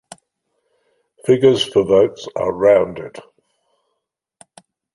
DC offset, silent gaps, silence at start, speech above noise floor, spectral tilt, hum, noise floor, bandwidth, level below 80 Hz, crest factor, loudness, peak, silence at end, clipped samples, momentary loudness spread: under 0.1%; none; 1.25 s; 61 dB; -5.5 dB/octave; none; -76 dBFS; 11.5 kHz; -54 dBFS; 18 dB; -16 LUFS; -2 dBFS; 1.75 s; under 0.1%; 13 LU